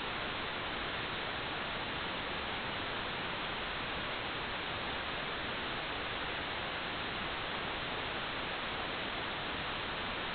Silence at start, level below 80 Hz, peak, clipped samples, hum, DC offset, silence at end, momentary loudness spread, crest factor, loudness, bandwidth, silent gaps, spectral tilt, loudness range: 0 s; -56 dBFS; -24 dBFS; under 0.1%; none; under 0.1%; 0 s; 0 LU; 14 dB; -37 LUFS; 4.9 kHz; none; -1 dB/octave; 0 LU